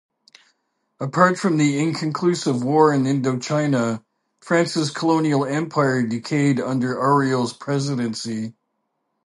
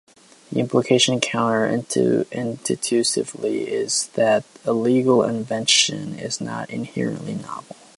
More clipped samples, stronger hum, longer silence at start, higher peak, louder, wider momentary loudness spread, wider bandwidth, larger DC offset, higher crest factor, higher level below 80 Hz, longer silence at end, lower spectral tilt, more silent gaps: neither; neither; first, 1 s vs 0.5 s; about the same, -2 dBFS vs -2 dBFS; about the same, -20 LUFS vs -21 LUFS; second, 9 LU vs 12 LU; about the same, 11.5 kHz vs 11.5 kHz; neither; about the same, 20 dB vs 18 dB; about the same, -68 dBFS vs -66 dBFS; first, 0.75 s vs 0.25 s; first, -6 dB/octave vs -3.5 dB/octave; neither